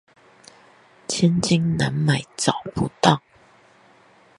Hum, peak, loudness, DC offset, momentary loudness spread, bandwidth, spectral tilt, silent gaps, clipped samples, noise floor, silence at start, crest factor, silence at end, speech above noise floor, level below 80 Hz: none; 0 dBFS; -21 LUFS; under 0.1%; 8 LU; 11.5 kHz; -5 dB/octave; none; under 0.1%; -54 dBFS; 1.1 s; 24 dB; 1.2 s; 34 dB; -52 dBFS